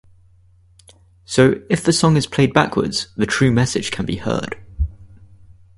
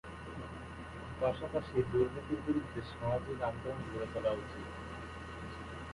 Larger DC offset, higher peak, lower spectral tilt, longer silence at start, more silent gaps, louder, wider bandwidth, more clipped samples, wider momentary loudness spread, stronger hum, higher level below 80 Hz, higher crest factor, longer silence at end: neither; first, 0 dBFS vs -18 dBFS; second, -5 dB/octave vs -7.5 dB/octave; first, 1.3 s vs 0.05 s; neither; first, -18 LUFS vs -38 LUFS; about the same, 11.5 kHz vs 11.5 kHz; neither; about the same, 11 LU vs 12 LU; neither; first, -36 dBFS vs -52 dBFS; about the same, 20 dB vs 20 dB; first, 0.7 s vs 0 s